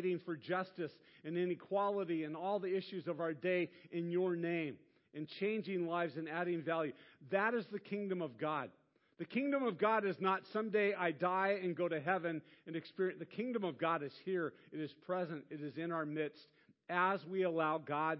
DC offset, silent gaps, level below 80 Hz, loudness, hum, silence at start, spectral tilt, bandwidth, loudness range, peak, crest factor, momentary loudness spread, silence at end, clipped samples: under 0.1%; none; under -90 dBFS; -39 LUFS; none; 0 s; -4.5 dB/octave; 5.6 kHz; 4 LU; -20 dBFS; 18 dB; 11 LU; 0 s; under 0.1%